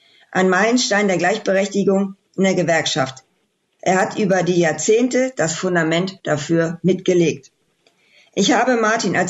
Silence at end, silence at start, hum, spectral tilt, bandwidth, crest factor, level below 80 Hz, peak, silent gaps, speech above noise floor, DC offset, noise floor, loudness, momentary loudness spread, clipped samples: 0 s; 0.3 s; none; -4.5 dB/octave; 8.2 kHz; 12 dB; -62 dBFS; -6 dBFS; none; 49 dB; under 0.1%; -67 dBFS; -18 LUFS; 7 LU; under 0.1%